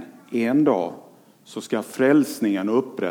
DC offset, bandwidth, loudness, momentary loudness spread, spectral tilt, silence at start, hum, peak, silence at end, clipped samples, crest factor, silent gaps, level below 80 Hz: under 0.1%; 18 kHz; -22 LUFS; 12 LU; -6 dB/octave; 0 s; none; -6 dBFS; 0 s; under 0.1%; 16 dB; none; -78 dBFS